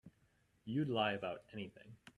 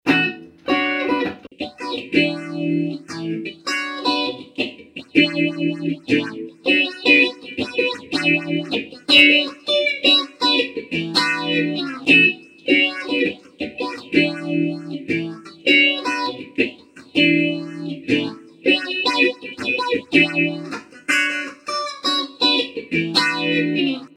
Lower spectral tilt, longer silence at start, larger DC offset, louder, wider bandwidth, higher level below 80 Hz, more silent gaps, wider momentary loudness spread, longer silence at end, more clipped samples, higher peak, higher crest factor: first, -7 dB/octave vs -4 dB/octave; about the same, 0.05 s vs 0.05 s; neither; second, -40 LUFS vs -18 LUFS; about the same, 11.5 kHz vs 12.5 kHz; second, -76 dBFS vs -62 dBFS; neither; first, 18 LU vs 14 LU; about the same, 0.05 s vs 0.1 s; neither; second, -22 dBFS vs 0 dBFS; about the same, 20 dB vs 20 dB